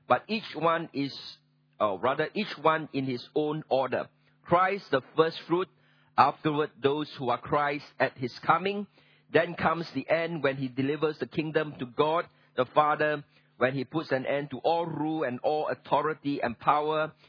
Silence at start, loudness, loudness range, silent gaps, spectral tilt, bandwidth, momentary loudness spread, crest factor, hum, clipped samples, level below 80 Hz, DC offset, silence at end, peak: 0.1 s; -29 LUFS; 2 LU; none; -7.5 dB/octave; 5.4 kHz; 8 LU; 24 dB; none; under 0.1%; -70 dBFS; under 0.1%; 0.2 s; -4 dBFS